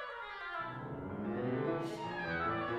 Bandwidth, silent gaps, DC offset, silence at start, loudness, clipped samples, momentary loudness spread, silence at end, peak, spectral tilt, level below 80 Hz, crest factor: 13 kHz; none; under 0.1%; 0 s; -39 LUFS; under 0.1%; 7 LU; 0 s; -24 dBFS; -7 dB/octave; -64 dBFS; 14 dB